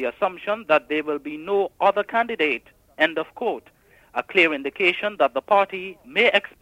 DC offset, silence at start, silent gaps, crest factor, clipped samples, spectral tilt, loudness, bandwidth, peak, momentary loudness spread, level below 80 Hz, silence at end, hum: under 0.1%; 0 s; none; 18 dB; under 0.1%; -4.5 dB/octave; -22 LUFS; 15.5 kHz; -4 dBFS; 10 LU; -64 dBFS; 0.15 s; none